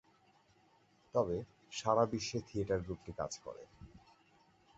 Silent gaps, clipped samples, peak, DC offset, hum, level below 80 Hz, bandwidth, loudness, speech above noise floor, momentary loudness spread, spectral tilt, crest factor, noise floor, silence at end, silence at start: none; under 0.1%; -16 dBFS; under 0.1%; none; -62 dBFS; 8 kHz; -38 LUFS; 33 dB; 21 LU; -5 dB/octave; 24 dB; -70 dBFS; 0.8 s; 1.15 s